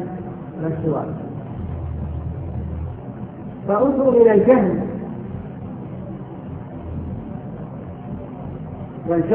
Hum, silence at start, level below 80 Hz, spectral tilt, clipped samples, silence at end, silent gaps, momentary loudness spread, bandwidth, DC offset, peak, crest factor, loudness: none; 0 s; -40 dBFS; -13.5 dB/octave; under 0.1%; 0 s; none; 18 LU; 3.5 kHz; under 0.1%; 0 dBFS; 20 dB; -22 LUFS